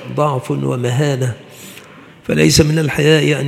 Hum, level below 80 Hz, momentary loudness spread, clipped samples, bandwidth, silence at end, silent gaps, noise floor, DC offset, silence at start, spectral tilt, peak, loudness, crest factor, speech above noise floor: none; -42 dBFS; 21 LU; under 0.1%; 16 kHz; 0 s; none; -39 dBFS; under 0.1%; 0 s; -5 dB/octave; 0 dBFS; -15 LUFS; 16 dB; 25 dB